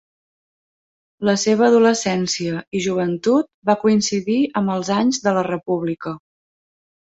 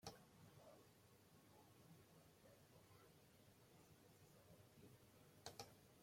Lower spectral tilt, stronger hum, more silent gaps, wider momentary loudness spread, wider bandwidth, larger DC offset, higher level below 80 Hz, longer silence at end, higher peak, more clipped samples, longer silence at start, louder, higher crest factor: about the same, -4.5 dB/octave vs -3.5 dB/octave; neither; first, 3.54-3.62 s vs none; about the same, 9 LU vs 10 LU; second, 8.2 kHz vs 16.5 kHz; neither; first, -62 dBFS vs -86 dBFS; first, 1 s vs 0 s; first, -2 dBFS vs -36 dBFS; neither; first, 1.2 s vs 0 s; first, -19 LUFS vs -66 LUFS; second, 18 dB vs 30 dB